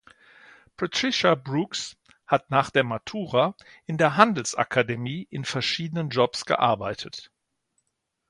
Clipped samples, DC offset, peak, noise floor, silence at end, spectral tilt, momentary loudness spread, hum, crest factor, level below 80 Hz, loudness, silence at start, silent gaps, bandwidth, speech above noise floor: under 0.1%; under 0.1%; -2 dBFS; -78 dBFS; 1.1 s; -4.5 dB/octave; 12 LU; none; 24 dB; -62 dBFS; -24 LUFS; 0.8 s; none; 11.5 kHz; 53 dB